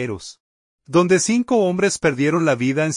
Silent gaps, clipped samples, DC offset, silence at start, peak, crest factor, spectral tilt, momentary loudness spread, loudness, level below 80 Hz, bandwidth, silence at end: 0.40-0.79 s; under 0.1%; under 0.1%; 0 s; -4 dBFS; 16 dB; -5 dB/octave; 10 LU; -18 LUFS; -56 dBFS; 11 kHz; 0 s